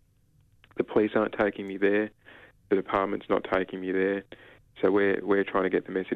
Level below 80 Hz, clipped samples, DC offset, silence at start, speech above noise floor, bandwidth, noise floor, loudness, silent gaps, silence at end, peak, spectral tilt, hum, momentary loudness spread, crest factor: -62 dBFS; under 0.1%; under 0.1%; 0.75 s; 37 dB; 4.7 kHz; -64 dBFS; -27 LUFS; none; 0 s; -12 dBFS; -8 dB/octave; none; 5 LU; 16 dB